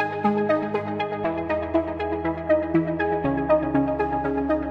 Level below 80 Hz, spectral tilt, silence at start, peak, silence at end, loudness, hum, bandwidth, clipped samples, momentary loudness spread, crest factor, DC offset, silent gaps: -44 dBFS; -9 dB/octave; 0 s; -8 dBFS; 0 s; -24 LUFS; none; 6 kHz; under 0.1%; 5 LU; 16 dB; under 0.1%; none